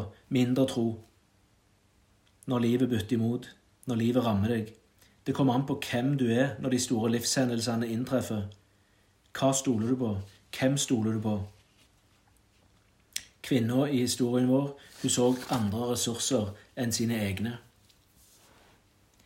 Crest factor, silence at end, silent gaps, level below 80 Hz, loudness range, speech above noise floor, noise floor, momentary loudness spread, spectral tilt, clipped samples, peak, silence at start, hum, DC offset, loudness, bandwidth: 18 dB; 1.65 s; none; -68 dBFS; 4 LU; 38 dB; -66 dBFS; 12 LU; -5 dB/octave; under 0.1%; -12 dBFS; 0 s; none; under 0.1%; -29 LUFS; 16 kHz